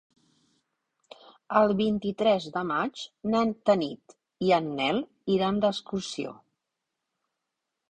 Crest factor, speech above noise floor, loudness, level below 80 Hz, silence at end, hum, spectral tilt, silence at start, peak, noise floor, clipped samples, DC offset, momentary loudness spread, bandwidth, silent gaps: 22 dB; 58 dB; -27 LUFS; -64 dBFS; 1.6 s; none; -6 dB/octave; 1.5 s; -8 dBFS; -84 dBFS; under 0.1%; under 0.1%; 11 LU; 9.4 kHz; none